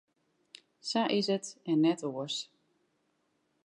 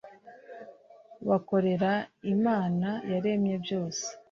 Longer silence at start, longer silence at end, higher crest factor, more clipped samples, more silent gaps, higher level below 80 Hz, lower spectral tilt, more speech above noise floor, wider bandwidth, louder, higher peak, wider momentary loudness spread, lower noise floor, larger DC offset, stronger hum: first, 0.85 s vs 0.05 s; first, 1.2 s vs 0.15 s; about the same, 18 dB vs 18 dB; neither; neither; second, -90 dBFS vs -70 dBFS; second, -4.5 dB/octave vs -6 dB/octave; first, 46 dB vs 26 dB; first, 11 kHz vs 7.6 kHz; about the same, -31 LUFS vs -29 LUFS; second, -16 dBFS vs -12 dBFS; second, 10 LU vs 17 LU; first, -76 dBFS vs -54 dBFS; neither; neither